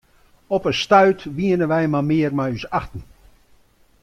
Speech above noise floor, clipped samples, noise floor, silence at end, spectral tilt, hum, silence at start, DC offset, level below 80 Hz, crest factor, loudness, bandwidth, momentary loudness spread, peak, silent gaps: 36 dB; under 0.1%; -55 dBFS; 1 s; -6.5 dB/octave; none; 0.5 s; under 0.1%; -48 dBFS; 18 dB; -19 LUFS; 12 kHz; 11 LU; -2 dBFS; none